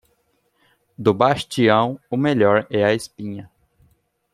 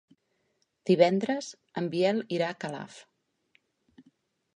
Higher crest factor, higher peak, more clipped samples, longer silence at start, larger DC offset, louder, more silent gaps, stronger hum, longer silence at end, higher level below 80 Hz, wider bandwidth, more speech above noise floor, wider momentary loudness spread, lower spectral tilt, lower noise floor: second, 18 dB vs 24 dB; first, -2 dBFS vs -8 dBFS; neither; first, 1 s vs 0.85 s; neither; first, -19 LUFS vs -28 LUFS; neither; neither; second, 0.9 s vs 1.55 s; first, -60 dBFS vs -80 dBFS; first, 13.5 kHz vs 10.5 kHz; about the same, 47 dB vs 48 dB; about the same, 15 LU vs 16 LU; about the same, -6 dB/octave vs -6 dB/octave; second, -66 dBFS vs -75 dBFS